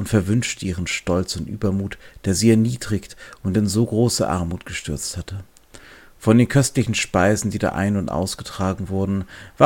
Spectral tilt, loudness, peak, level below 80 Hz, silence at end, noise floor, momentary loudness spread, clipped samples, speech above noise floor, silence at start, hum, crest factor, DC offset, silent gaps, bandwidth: -5.5 dB/octave; -21 LUFS; 0 dBFS; -42 dBFS; 0 s; -45 dBFS; 12 LU; under 0.1%; 25 dB; 0 s; none; 20 dB; under 0.1%; none; 17 kHz